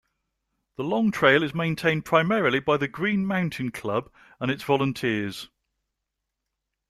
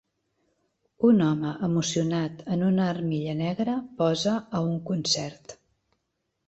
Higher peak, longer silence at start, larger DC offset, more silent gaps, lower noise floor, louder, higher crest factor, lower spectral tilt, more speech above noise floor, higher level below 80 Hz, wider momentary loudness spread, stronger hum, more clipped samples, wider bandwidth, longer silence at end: first, -4 dBFS vs -10 dBFS; second, 0.8 s vs 1 s; neither; neither; first, -83 dBFS vs -79 dBFS; about the same, -24 LUFS vs -26 LUFS; first, 22 dB vs 16 dB; about the same, -6 dB/octave vs -5.5 dB/octave; first, 59 dB vs 53 dB; about the same, -60 dBFS vs -64 dBFS; first, 12 LU vs 7 LU; neither; neither; first, 14 kHz vs 8.2 kHz; first, 1.45 s vs 0.95 s